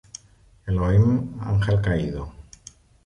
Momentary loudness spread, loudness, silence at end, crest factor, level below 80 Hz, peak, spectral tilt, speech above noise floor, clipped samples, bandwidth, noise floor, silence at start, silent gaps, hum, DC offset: 23 LU; -22 LUFS; 0.65 s; 16 dB; -36 dBFS; -8 dBFS; -7.5 dB/octave; 34 dB; under 0.1%; 9.6 kHz; -55 dBFS; 0.65 s; none; none; under 0.1%